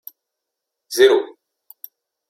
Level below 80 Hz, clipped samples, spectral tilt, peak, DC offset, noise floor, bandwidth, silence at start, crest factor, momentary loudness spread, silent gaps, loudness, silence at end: -68 dBFS; under 0.1%; -1.5 dB/octave; -2 dBFS; under 0.1%; -81 dBFS; 15.5 kHz; 0.9 s; 20 dB; 25 LU; none; -16 LUFS; 1.05 s